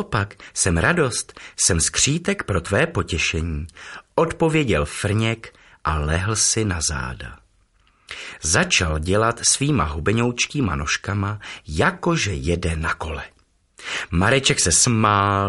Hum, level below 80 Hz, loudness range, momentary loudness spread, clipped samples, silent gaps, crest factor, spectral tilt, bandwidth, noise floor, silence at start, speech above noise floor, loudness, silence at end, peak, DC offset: none; -36 dBFS; 3 LU; 14 LU; under 0.1%; none; 20 dB; -3.5 dB/octave; 11.5 kHz; -60 dBFS; 0 s; 39 dB; -20 LUFS; 0 s; -2 dBFS; under 0.1%